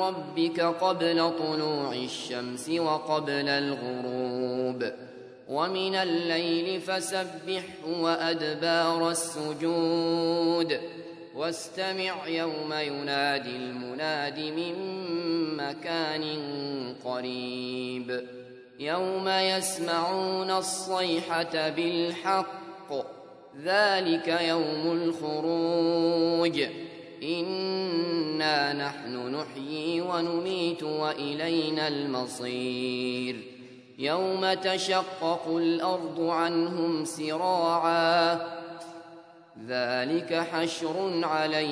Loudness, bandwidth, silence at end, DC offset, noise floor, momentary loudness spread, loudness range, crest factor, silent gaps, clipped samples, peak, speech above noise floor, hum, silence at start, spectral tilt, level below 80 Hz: -28 LUFS; 11 kHz; 0 s; under 0.1%; -50 dBFS; 10 LU; 4 LU; 20 dB; none; under 0.1%; -10 dBFS; 22 dB; none; 0 s; -4 dB/octave; -78 dBFS